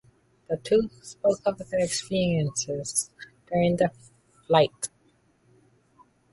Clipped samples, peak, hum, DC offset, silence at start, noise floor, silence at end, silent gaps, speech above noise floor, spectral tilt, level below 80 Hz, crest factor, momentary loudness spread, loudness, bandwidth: under 0.1%; -6 dBFS; none; under 0.1%; 0.5 s; -64 dBFS; 1.45 s; none; 39 dB; -4.5 dB/octave; -58 dBFS; 22 dB; 13 LU; -26 LUFS; 12 kHz